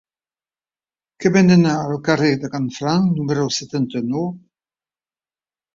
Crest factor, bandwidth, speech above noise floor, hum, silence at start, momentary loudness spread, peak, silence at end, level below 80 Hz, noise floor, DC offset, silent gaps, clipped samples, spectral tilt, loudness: 18 dB; 7.6 kHz; over 73 dB; none; 1.2 s; 10 LU; -2 dBFS; 1.35 s; -58 dBFS; under -90 dBFS; under 0.1%; none; under 0.1%; -6 dB/octave; -18 LUFS